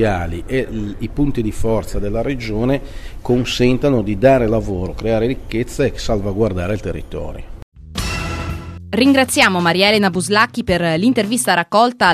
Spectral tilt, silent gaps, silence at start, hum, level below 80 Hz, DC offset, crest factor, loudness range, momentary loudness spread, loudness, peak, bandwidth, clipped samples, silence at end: -5 dB/octave; 7.62-7.72 s; 0 s; none; -30 dBFS; under 0.1%; 16 dB; 7 LU; 13 LU; -17 LUFS; 0 dBFS; 14 kHz; under 0.1%; 0 s